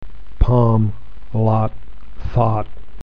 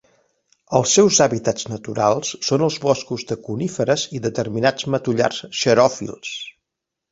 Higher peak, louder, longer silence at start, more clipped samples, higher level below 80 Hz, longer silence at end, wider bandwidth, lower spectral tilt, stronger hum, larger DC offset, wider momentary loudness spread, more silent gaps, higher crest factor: about the same, 0 dBFS vs -2 dBFS; about the same, -19 LUFS vs -19 LUFS; second, 0 s vs 0.7 s; neither; first, -26 dBFS vs -56 dBFS; second, 0 s vs 0.6 s; second, 4.9 kHz vs 8 kHz; first, -11 dB/octave vs -4 dB/octave; neither; first, 8% vs under 0.1%; first, 17 LU vs 13 LU; neither; about the same, 18 dB vs 18 dB